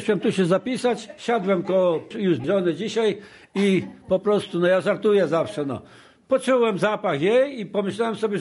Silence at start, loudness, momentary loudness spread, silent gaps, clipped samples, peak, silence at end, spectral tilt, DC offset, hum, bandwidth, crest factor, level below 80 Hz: 0 s; -22 LUFS; 7 LU; none; under 0.1%; -8 dBFS; 0 s; -6 dB/octave; under 0.1%; none; 11.5 kHz; 14 dB; -62 dBFS